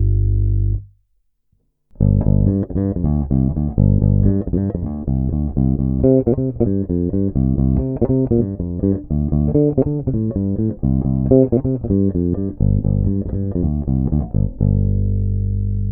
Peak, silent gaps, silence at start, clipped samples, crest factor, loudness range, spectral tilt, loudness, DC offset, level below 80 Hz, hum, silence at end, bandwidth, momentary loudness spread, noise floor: 0 dBFS; none; 0 s; under 0.1%; 16 dB; 2 LU; -16.5 dB/octave; -18 LUFS; under 0.1%; -24 dBFS; 50 Hz at -35 dBFS; 0 s; 1.8 kHz; 6 LU; -64 dBFS